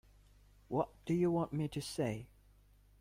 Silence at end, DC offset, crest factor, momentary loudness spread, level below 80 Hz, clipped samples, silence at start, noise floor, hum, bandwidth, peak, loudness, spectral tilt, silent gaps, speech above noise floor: 0.75 s; under 0.1%; 18 dB; 8 LU; -62 dBFS; under 0.1%; 0.7 s; -65 dBFS; 50 Hz at -55 dBFS; 16 kHz; -22 dBFS; -37 LUFS; -7 dB/octave; none; 29 dB